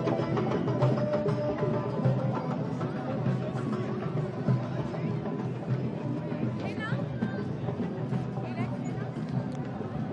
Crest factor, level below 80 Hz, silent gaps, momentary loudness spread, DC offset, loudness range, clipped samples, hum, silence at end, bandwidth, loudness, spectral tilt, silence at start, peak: 16 dB; -60 dBFS; none; 6 LU; under 0.1%; 4 LU; under 0.1%; none; 0 s; 8.2 kHz; -31 LUFS; -9 dB/octave; 0 s; -14 dBFS